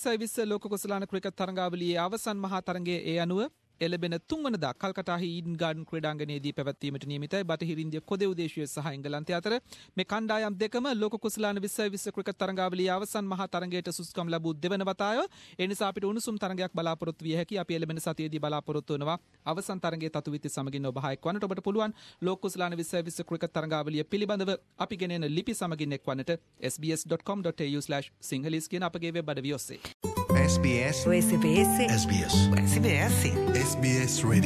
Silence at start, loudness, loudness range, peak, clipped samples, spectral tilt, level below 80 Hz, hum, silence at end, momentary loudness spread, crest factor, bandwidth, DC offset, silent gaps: 0 s; -31 LUFS; 8 LU; -10 dBFS; under 0.1%; -5 dB/octave; -48 dBFS; none; 0 s; 10 LU; 20 dB; 14.5 kHz; under 0.1%; 29.94-30.00 s